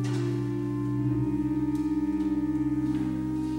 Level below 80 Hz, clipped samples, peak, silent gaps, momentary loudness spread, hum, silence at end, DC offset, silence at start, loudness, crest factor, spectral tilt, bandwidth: -46 dBFS; under 0.1%; -18 dBFS; none; 2 LU; none; 0 s; under 0.1%; 0 s; -28 LUFS; 10 dB; -8.5 dB/octave; 10.5 kHz